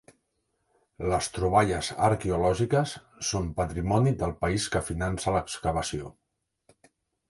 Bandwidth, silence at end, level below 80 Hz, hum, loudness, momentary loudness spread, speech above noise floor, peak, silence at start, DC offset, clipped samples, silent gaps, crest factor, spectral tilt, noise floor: 11.5 kHz; 1.2 s; -44 dBFS; none; -27 LUFS; 8 LU; 50 dB; -8 dBFS; 1 s; under 0.1%; under 0.1%; none; 20 dB; -5 dB/octave; -76 dBFS